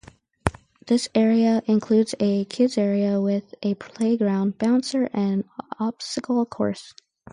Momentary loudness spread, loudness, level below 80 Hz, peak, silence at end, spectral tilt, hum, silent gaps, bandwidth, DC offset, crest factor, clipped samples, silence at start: 9 LU; -23 LUFS; -50 dBFS; 0 dBFS; 0.4 s; -6 dB/octave; none; none; 11 kHz; under 0.1%; 22 dB; under 0.1%; 0.45 s